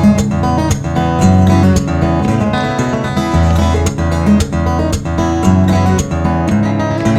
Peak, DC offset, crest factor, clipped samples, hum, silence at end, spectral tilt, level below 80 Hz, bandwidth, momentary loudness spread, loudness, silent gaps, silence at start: 0 dBFS; under 0.1%; 12 dB; under 0.1%; none; 0 s; -6.5 dB/octave; -26 dBFS; 14 kHz; 5 LU; -13 LUFS; none; 0 s